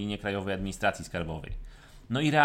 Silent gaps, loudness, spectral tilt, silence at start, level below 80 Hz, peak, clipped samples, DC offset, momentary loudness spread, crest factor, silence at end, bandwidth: none; -32 LUFS; -5.5 dB/octave; 0 s; -46 dBFS; -8 dBFS; under 0.1%; under 0.1%; 15 LU; 22 dB; 0 s; 16 kHz